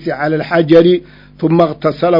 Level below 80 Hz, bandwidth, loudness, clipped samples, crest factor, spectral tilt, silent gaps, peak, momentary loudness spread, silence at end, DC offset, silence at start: -46 dBFS; 6 kHz; -12 LUFS; 0.7%; 12 dB; -9 dB/octave; none; 0 dBFS; 8 LU; 0 s; under 0.1%; 0 s